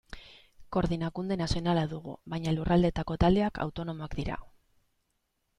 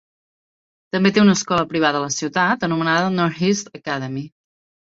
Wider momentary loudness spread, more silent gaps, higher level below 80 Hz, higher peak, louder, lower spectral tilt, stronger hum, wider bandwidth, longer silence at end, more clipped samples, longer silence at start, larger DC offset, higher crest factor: about the same, 13 LU vs 11 LU; neither; first, -44 dBFS vs -58 dBFS; second, -10 dBFS vs -2 dBFS; second, -30 LUFS vs -19 LUFS; first, -7 dB/octave vs -4.5 dB/octave; neither; first, 10.5 kHz vs 7.8 kHz; first, 1.1 s vs 0.55 s; neither; second, 0.1 s vs 0.95 s; neither; about the same, 20 dB vs 18 dB